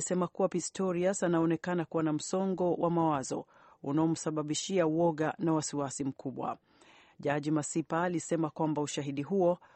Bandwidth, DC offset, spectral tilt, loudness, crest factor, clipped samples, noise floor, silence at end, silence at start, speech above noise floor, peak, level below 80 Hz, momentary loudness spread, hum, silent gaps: 8.8 kHz; under 0.1%; -5.5 dB/octave; -32 LUFS; 16 dB; under 0.1%; -61 dBFS; 0.2 s; 0 s; 29 dB; -16 dBFS; -72 dBFS; 8 LU; none; none